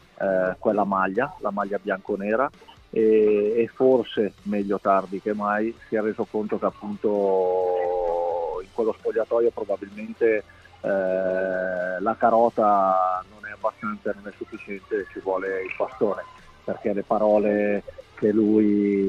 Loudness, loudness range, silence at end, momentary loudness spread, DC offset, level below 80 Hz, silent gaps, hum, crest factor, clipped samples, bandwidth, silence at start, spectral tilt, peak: -24 LUFS; 4 LU; 0 s; 11 LU; under 0.1%; -56 dBFS; none; none; 18 dB; under 0.1%; 7.2 kHz; 0.2 s; -8 dB/octave; -6 dBFS